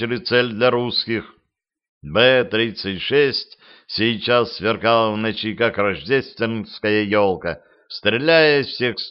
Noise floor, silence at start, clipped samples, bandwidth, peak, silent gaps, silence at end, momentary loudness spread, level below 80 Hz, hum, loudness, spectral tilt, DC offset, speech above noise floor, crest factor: -75 dBFS; 0 s; under 0.1%; 6 kHz; 0 dBFS; 1.89-2.01 s; 0 s; 10 LU; -54 dBFS; none; -19 LUFS; -8 dB/octave; under 0.1%; 56 dB; 18 dB